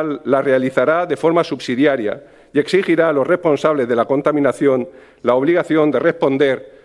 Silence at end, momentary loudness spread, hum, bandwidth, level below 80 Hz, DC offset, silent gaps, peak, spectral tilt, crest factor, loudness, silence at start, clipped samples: 0.15 s; 6 LU; none; 12 kHz; -60 dBFS; under 0.1%; none; 0 dBFS; -6.5 dB/octave; 16 dB; -16 LUFS; 0 s; under 0.1%